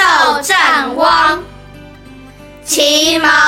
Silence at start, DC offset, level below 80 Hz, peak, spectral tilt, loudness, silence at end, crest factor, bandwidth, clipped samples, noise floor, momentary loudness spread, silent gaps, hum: 0 s; under 0.1%; -42 dBFS; 0 dBFS; -1 dB/octave; -10 LUFS; 0 s; 12 dB; 16.5 kHz; under 0.1%; -35 dBFS; 7 LU; none; none